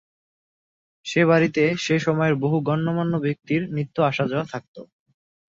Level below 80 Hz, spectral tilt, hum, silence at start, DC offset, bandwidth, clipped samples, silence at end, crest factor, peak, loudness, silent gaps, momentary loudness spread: -62 dBFS; -6.5 dB/octave; none; 1.05 s; under 0.1%; 7.8 kHz; under 0.1%; 0.65 s; 18 dB; -6 dBFS; -22 LUFS; 4.68-4.74 s; 9 LU